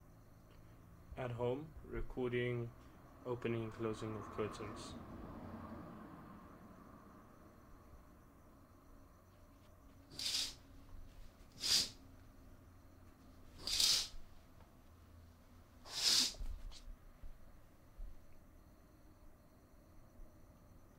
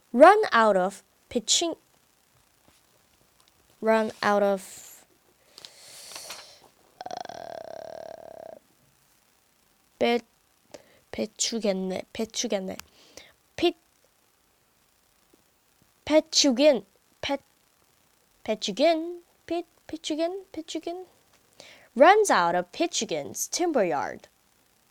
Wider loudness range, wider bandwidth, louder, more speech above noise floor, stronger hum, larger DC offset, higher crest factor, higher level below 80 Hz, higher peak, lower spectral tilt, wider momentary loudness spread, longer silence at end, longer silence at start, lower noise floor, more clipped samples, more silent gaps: first, 20 LU vs 17 LU; about the same, 16 kHz vs 17.5 kHz; second, -39 LUFS vs -25 LUFS; second, 21 dB vs 42 dB; neither; neither; about the same, 26 dB vs 24 dB; first, -58 dBFS vs -68 dBFS; second, -18 dBFS vs -4 dBFS; about the same, -2.5 dB/octave vs -2.5 dB/octave; first, 29 LU vs 23 LU; second, 0 s vs 0.75 s; second, 0 s vs 0.15 s; about the same, -64 dBFS vs -66 dBFS; neither; neither